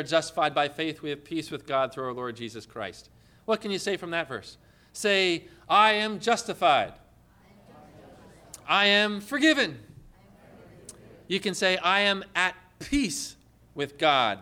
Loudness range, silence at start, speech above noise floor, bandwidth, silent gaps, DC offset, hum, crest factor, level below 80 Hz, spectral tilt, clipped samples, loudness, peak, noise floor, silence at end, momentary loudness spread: 7 LU; 0 s; 31 dB; 18 kHz; none; under 0.1%; none; 18 dB; -58 dBFS; -3 dB/octave; under 0.1%; -25 LUFS; -10 dBFS; -57 dBFS; 0 s; 17 LU